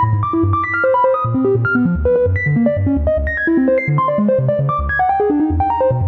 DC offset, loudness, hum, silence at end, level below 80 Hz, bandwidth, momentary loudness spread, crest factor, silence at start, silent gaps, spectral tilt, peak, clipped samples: under 0.1%; -15 LUFS; none; 0 s; -28 dBFS; 4.4 kHz; 2 LU; 12 dB; 0 s; none; -11 dB/octave; -4 dBFS; under 0.1%